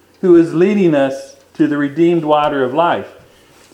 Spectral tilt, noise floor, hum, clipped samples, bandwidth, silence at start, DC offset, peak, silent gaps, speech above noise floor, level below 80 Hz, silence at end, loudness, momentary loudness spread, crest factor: -7.5 dB/octave; -46 dBFS; none; under 0.1%; 9 kHz; 0.25 s; under 0.1%; 0 dBFS; none; 33 dB; -56 dBFS; 0.65 s; -14 LUFS; 8 LU; 14 dB